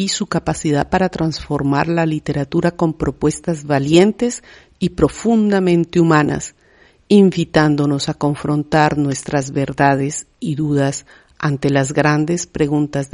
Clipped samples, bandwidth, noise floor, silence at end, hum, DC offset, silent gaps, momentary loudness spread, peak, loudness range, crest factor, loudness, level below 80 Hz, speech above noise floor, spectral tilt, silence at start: under 0.1%; 11 kHz; -51 dBFS; 0.1 s; none; under 0.1%; none; 8 LU; 0 dBFS; 3 LU; 16 dB; -17 LUFS; -42 dBFS; 35 dB; -6 dB/octave; 0 s